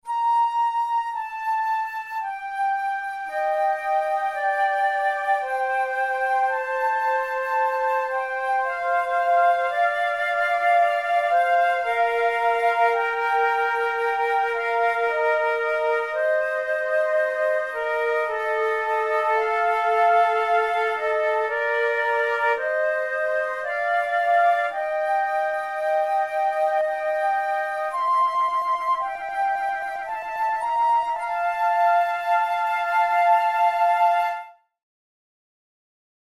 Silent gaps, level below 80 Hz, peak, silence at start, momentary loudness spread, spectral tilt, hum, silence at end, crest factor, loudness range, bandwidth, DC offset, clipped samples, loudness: none; -64 dBFS; -8 dBFS; 0.05 s; 6 LU; -1 dB/octave; none; 1.8 s; 14 dB; 3 LU; 14 kHz; under 0.1%; under 0.1%; -22 LUFS